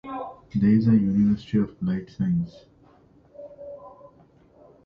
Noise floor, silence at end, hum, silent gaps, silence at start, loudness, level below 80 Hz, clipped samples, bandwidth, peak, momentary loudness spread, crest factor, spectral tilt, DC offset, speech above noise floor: -56 dBFS; 0.95 s; none; none; 0.05 s; -23 LUFS; -52 dBFS; under 0.1%; 5.8 kHz; -10 dBFS; 23 LU; 16 dB; -10 dB/octave; under 0.1%; 34 dB